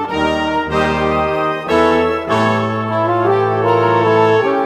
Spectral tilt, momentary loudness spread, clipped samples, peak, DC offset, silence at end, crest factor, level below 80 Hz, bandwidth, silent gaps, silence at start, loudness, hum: -6.5 dB/octave; 5 LU; under 0.1%; -2 dBFS; under 0.1%; 0 s; 14 dB; -42 dBFS; 12 kHz; none; 0 s; -15 LUFS; none